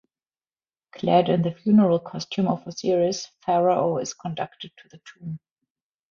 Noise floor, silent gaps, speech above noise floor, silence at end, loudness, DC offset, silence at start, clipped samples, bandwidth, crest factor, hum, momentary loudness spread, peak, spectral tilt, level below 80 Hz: under -90 dBFS; none; over 67 dB; 0.75 s; -23 LUFS; under 0.1%; 1 s; under 0.1%; 7.4 kHz; 20 dB; none; 18 LU; -4 dBFS; -6.5 dB/octave; -66 dBFS